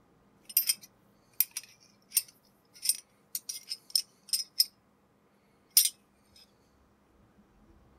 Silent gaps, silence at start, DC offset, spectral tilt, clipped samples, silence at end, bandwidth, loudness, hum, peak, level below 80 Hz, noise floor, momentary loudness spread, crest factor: none; 0.5 s; under 0.1%; 3 dB/octave; under 0.1%; 2.05 s; 16 kHz; -30 LUFS; none; -4 dBFS; -76 dBFS; -67 dBFS; 15 LU; 32 dB